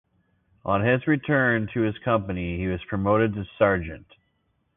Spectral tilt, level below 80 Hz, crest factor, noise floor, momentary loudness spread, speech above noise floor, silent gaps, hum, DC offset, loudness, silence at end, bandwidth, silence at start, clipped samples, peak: -11.5 dB/octave; -46 dBFS; 20 dB; -71 dBFS; 8 LU; 47 dB; none; none; under 0.1%; -24 LUFS; 0.8 s; 3.9 kHz; 0.65 s; under 0.1%; -6 dBFS